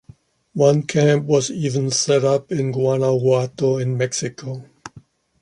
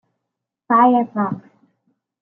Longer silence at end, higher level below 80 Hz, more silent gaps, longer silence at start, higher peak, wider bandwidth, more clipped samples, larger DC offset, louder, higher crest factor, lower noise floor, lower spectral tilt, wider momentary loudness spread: second, 0.4 s vs 0.8 s; first, -60 dBFS vs -72 dBFS; neither; second, 0.55 s vs 0.7 s; about the same, -2 dBFS vs -4 dBFS; first, 11.5 kHz vs 3.5 kHz; neither; neither; about the same, -19 LUFS vs -17 LUFS; about the same, 16 dB vs 16 dB; second, -49 dBFS vs -81 dBFS; second, -5.5 dB/octave vs -10 dB/octave; about the same, 14 LU vs 12 LU